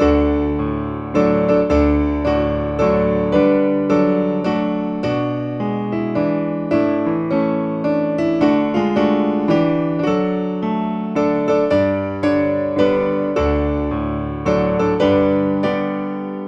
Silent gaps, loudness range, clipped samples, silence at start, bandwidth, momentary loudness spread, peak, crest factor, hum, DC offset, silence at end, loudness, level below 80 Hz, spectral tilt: none; 3 LU; under 0.1%; 0 s; 7.2 kHz; 6 LU; -2 dBFS; 14 dB; none; under 0.1%; 0 s; -18 LUFS; -32 dBFS; -8.5 dB/octave